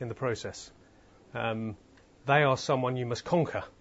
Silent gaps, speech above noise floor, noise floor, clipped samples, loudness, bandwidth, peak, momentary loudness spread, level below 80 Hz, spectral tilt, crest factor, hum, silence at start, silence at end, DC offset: none; 29 dB; -58 dBFS; under 0.1%; -30 LUFS; 8 kHz; -10 dBFS; 18 LU; -64 dBFS; -5.5 dB/octave; 22 dB; none; 0 s; 0.1 s; under 0.1%